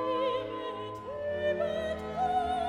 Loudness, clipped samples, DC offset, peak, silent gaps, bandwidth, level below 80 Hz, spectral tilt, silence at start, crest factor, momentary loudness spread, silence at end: -33 LUFS; under 0.1%; under 0.1%; -20 dBFS; none; 11 kHz; -56 dBFS; -6 dB/octave; 0 s; 12 dB; 8 LU; 0 s